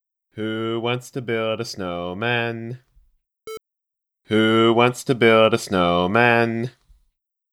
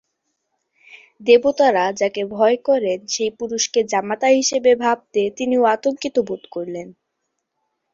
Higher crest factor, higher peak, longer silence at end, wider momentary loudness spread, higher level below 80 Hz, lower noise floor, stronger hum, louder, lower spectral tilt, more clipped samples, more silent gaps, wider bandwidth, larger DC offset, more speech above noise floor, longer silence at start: about the same, 20 dB vs 18 dB; about the same, -2 dBFS vs -2 dBFS; second, 0.85 s vs 1.05 s; first, 18 LU vs 12 LU; about the same, -60 dBFS vs -64 dBFS; first, -84 dBFS vs -76 dBFS; neither; about the same, -20 LUFS vs -18 LUFS; first, -5.5 dB/octave vs -3 dB/octave; neither; neither; first, 15 kHz vs 7.8 kHz; neither; first, 64 dB vs 57 dB; second, 0.35 s vs 0.95 s